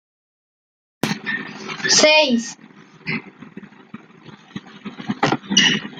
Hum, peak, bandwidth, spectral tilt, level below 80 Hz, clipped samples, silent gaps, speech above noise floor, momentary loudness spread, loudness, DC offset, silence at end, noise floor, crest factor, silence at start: none; -2 dBFS; 14 kHz; -2 dB/octave; -64 dBFS; under 0.1%; none; 27 dB; 23 LU; -17 LUFS; under 0.1%; 0 s; -44 dBFS; 20 dB; 1.05 s